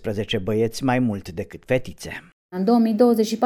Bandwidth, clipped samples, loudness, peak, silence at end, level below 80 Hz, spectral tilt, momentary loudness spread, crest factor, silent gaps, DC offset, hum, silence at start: 18.5 kHz; under 0.1%; -21 LUFS; -4 dBFS; 0 s; -50 dBFS; -6 dB/octave; 17 LU; 16 dB; 2.32-2.49 s; under 0.1%; none; 0 s